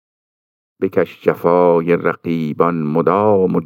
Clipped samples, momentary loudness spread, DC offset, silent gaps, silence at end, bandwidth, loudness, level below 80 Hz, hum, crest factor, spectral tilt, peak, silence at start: under 0.1%; 7 LU; under 0.1%; none; 0 s; 16 kHz; -16 LUFS; -62 dBFS; none; 16 dB; -9.5 dB/octave; -2 dBFS; 0.8 s